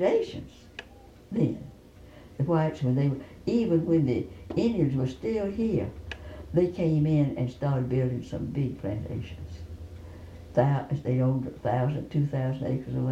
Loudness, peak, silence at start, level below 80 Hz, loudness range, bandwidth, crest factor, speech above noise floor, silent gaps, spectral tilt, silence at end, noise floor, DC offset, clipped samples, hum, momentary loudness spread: -28 LUFS; -10 dBFS; 0 s; -50 dBFS; 4 LU; 8 kHz; 16 dB; 24 dB; none; -9 dB/octave; 0 s; -51 dBFS; under 0.1%; under 0.1%; none; 17 LU